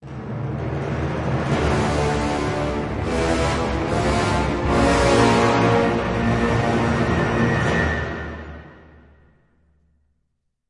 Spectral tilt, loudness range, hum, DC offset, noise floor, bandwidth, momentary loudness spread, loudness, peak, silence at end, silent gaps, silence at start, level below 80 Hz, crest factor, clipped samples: -6 dB/octave; 5 LU; none; under 0.1%; -73 dBFS; 11.5 kHz; 11 LU; -20 LUFS; -2 dBFS; 1.95 s; none; 0 s; -34 dBFS; 18 dB; under 0.1%